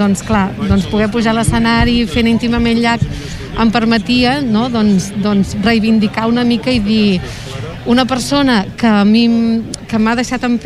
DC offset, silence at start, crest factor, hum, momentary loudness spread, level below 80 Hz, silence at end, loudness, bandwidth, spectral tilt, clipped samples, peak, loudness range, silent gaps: under 0.1%; 0 s; 12 dB; none; 6 LU; -30 dBFS; 0 s; -13 LUFS; 12.5 kHz; -5.5 dB/octave; under 0.1%; 0 dBFS; 1 LU; none